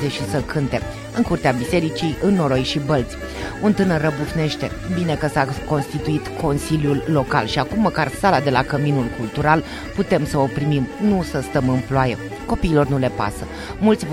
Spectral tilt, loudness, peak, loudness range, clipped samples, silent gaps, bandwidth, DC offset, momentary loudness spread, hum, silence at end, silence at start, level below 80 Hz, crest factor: -6.5 dB/octave; -20 LUFS; -2 dBFS; 2 LU; under 0.1%; none; 16 kHz; under 0.1%; 7 LU; none; 0 s; 0 s; -36 dBFS; 18 dB